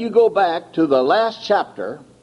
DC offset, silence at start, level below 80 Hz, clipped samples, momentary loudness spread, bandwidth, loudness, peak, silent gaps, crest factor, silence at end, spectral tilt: under 0.1%; 0 s; -64 dBFS; under 0.1%; 13 LU; 10.5 kHz; -18 LUFS; -4 dBFS; none; 14 dB; 0.25 s; -5.5 dB/octave